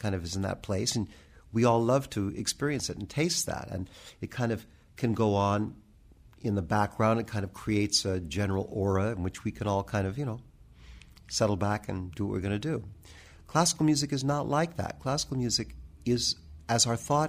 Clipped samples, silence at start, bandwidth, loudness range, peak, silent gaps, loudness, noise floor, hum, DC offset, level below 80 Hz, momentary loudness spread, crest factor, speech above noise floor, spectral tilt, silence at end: under 0.1%; 0 s; 15.5 kHz; 3 LU; -10 dBFS; none; -30 LUFS; -56 dBFS; none; under 0.1%; -52 dBFS; 11 LU; 20 dB; 27 dB; -4.5 dB/octave; 0 s